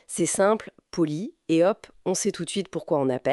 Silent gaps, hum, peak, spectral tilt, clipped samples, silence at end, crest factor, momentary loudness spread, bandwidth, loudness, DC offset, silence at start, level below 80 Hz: none; none; -10 dBFS; -4.5 dB/octave; under 0.1%; 0 s; 16 dB; 8 LU; 12 kHz; -25 LUFS; under 0.1%; 0.1 s; -64 dBFS